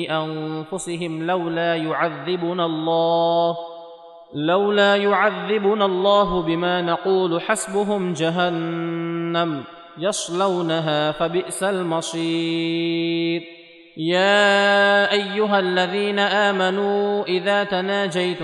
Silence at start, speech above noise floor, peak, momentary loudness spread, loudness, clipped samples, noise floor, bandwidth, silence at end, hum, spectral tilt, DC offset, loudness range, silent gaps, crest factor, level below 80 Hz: 0 s; 22 dB; -4 dBFS; 9 LU; -20 LUFS; under 0.1%; -42 dBFS; 12 kHz; 0 s; none; -4.5 dB/octave; under 0.1%; 5 LU; none; 16 dB; -56 dBFS